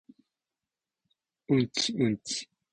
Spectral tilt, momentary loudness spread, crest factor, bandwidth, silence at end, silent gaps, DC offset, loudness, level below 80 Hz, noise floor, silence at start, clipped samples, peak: -4.5 dB/octave; 8 LU; 20 dB; 9.8 kHz; 0.3 s; none; under 0.1%; -29 LUFS; -66 dBFS; under -90 dBFS; 1.5 s; under 0.1%; -14 dBFS